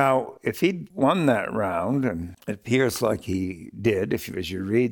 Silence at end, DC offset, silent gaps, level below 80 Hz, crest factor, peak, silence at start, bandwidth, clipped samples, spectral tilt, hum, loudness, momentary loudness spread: 0 s; under 0.1%; none; -54 dBFS; 18 dB; -6 dBFS; 0 s; 19 kHz; under 0.1%; -6 dB/octave; none; -25 LUFS; 9 LU